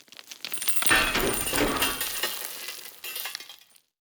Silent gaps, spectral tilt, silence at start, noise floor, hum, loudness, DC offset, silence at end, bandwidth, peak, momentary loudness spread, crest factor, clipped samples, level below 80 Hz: none; -1.5 dB/octave; 0.25 s; -53 dBFS; none; -25 LUFS; under 0.1%; 0.45 s; over 20 kHz; -6 dBFS; 18 LU; 22 dB; under 0.1%; -46 dBFS